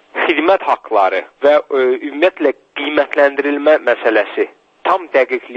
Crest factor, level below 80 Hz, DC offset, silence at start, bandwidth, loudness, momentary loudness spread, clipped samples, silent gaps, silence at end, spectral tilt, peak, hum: 14 dB; -66 dBFS; under 0.1%; 0.15 s; 6.8 kHz; -15 LUFS; 6 LU; under 0.1%; none; 0 s; -4.5 dB/octave; 0 dBFS; none